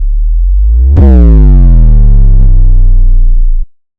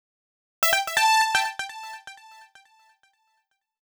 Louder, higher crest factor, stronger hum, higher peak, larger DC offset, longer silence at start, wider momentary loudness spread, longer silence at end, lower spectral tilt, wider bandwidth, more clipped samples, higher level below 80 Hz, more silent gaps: first, -8 LUFS vs -22 LUFS; second, 2 dB vs 20 dB; neither; first, 0 dBFS vs -8 dBFS; neither; second, 0 s vs 0.6 s; second, 9 LU vs 21 LU; second, 0.35 s vs 1.7 s; first, -12 dB/octave vs 2 dB/octave; second, 1.8 kHz vs over 20 kHz; first, 7% vs under 0.1%; first, -4 dBFS vs -70 dBFS; neither